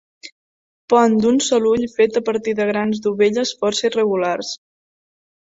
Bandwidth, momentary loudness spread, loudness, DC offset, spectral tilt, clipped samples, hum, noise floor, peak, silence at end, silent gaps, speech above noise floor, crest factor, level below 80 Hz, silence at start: 7.8 kHz; 6 LU; -18 LUFS; under 0.1%; -4 dB/octave; under 0.1%; none; under -90 dBFS; -2 dBFS; 1 s; 0.32-0.88 s; over 73 dB; 18 dB; -60 dBFS; 0.25 s